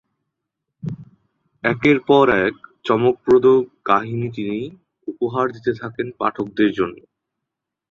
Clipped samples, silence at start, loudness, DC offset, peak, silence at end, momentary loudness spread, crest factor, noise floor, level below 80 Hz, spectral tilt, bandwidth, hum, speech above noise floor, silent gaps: under 0.1%; 0.85 s; -19 LUFS; under 0.1%; -2 dBFS; 0.95 s; 18 LU; 18 dB; -82 dBFS; -56 dBFS; -7.5 dB/octave; 7 kHz; none; 64 dB; none